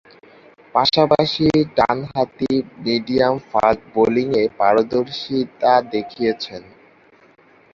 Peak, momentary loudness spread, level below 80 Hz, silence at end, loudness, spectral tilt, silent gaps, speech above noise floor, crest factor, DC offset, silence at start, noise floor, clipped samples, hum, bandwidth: 0 dBFS; 7 LU; -52 dBFS; 1.15 s; -18 LUFS; -6.5 dB/octave; none; 34 dB; 18 dB; under 0.1%; 0.75 s; -51 dBFS; under 0.1%; none; 7.4 kHz